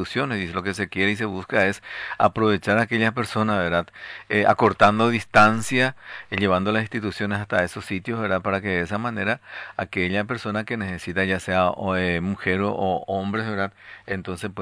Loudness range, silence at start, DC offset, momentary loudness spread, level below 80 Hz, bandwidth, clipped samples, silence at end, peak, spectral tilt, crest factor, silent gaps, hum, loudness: 5 LU; 0 s; under 0.1%; 12 LU; -54 dBFS; 11 kHz; under 0.1%; 0 s; -2 dBFS; -5.5 dB/octave; 20 dB; none; none; -23 LUFS